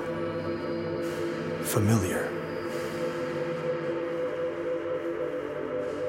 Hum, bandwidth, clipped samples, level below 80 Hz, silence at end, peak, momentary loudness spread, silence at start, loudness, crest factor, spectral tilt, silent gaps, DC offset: none; 16.5 kHz; under 0.1%; -62 dBFS; 0 s; -12 dBFS; 7 LU; 0 s; -31 LUFS; 18 dB; -6 dB/octave; none; under 0.1%